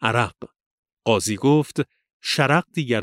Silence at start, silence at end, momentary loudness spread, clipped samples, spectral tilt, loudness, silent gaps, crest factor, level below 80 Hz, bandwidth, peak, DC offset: 0 s; 0 s; 10 LU; under 0.1%; -5 dB/octave; -22 LUFS; 0.66-0.83 s, 0.93-0.97 s, 2.13-2.20 s; 20 dB; -60 dBFS; 16 kHz; -2 dBFS; under 0.1%